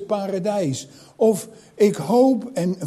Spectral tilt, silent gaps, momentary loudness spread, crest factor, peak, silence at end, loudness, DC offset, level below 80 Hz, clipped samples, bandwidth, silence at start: -6.5 dB/octave; none; 10 LU; 16 dB; -4 dBFS; 0 s; -21 LUFS; under 0.1%; -66 dBFS; under 0.1%; 14.5 kHz; 0 s